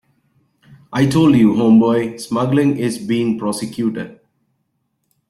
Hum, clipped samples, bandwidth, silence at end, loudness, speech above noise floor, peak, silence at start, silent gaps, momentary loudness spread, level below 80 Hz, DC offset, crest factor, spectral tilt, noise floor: none; under 0.1%; 12.5 kHz; 1.15 s; -16 LUFS; 54 dB; -2 dBFS; 0.9 s; none; 11 LU; -54 dBFS; under 0.1%; 14 dB; -6.5 dB/octave; -69 dBFS